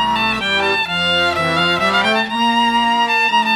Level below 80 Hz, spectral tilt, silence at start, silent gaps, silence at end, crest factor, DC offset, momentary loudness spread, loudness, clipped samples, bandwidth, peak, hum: -46 dBFS; -3.5 dB/octave; 0 s; none; 0 s; 12 dB; under 0.1%; 2 LU; -15 LUFS; under 0.1%; 18 kHz; -2 dBFS; none